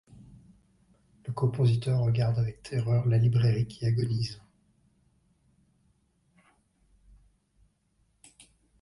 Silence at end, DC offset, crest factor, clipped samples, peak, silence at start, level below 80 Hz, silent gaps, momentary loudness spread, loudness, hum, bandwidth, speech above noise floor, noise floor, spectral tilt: 4.45 s; under 0.1%; 16 dB; under 0.1%; -14 dBFS; 1.25 s; -56 dBFS; none; 11 LU; -28 LUFS; none; 11 kHz; 45 dB; -71 dBFS; -8 dB/octave